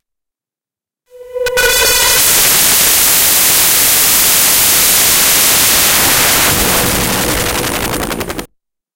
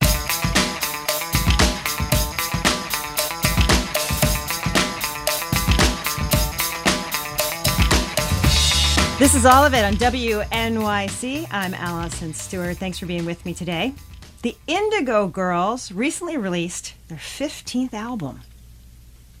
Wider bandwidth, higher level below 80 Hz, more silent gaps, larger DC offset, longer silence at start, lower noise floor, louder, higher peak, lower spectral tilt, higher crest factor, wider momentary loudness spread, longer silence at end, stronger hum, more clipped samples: about the same, over 20 kHz vs over 20 kHz; about the same, -32 dBFS vs -30 dBFS; neither; neither; first, 1.15 s vs 0 s; first, -89 dBFS vs -45 dBFS; first, -7 LUFS vs -20 LUFS; about the same, 0 dBFS vs -2 dBFS; second, -0.5 dB/octave vs -3.5 dB/octave; second, 12 dB vs 20 dB; about the same, 10 LU vs 12 LU; first, 0.5 s vs 0 s; neither; first, 0.1% vs under 0.1%